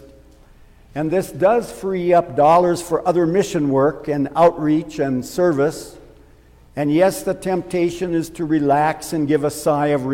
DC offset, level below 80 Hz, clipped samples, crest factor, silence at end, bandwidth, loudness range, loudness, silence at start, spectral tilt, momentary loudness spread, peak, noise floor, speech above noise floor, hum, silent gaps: under 0.1%; -48 dBFS; under 0.1%; 16 dB; 0 s; 16.5 kHz; 4 LU; -18 LUFS; 0.95 s; -6.5 dB/octave; 8 LU; -4 dBFS; -48 dBFS; 30 dB; none; none